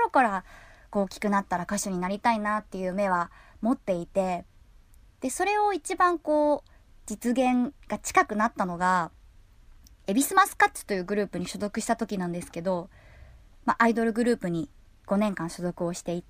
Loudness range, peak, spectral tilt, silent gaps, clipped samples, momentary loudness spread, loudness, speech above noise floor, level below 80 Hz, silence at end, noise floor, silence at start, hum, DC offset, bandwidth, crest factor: 3 LU; -6 dBFS; -5 dB/octave; none; under 0.1%; 10 LU; -27 LUFS; 28 dB; -54 dBFS; 0.1 s; -54 dBFS; 0 s; none; under 0.1%; 15.5 kHz; 22 dB